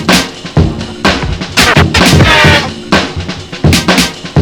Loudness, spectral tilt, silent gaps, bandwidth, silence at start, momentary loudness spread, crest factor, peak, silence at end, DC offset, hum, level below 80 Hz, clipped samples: -8 LUFS; -4 dB/octave; none; over 20 kHz; 0 s; 10 LU; 10 dB; 0 dBFS; 0 s; under 0.1%; none; -22 dBFS; 2%